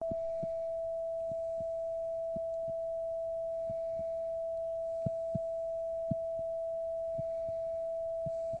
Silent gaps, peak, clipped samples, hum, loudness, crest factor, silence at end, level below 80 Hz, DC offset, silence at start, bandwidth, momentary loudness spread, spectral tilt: none; -20 dBFS; under 0.1%; none; -37 LUFS; 16 dB; 0 s; -62 dBFS; under 0.1%; 0 s; 8.6 kHz; 1 LU; -9 dB/octave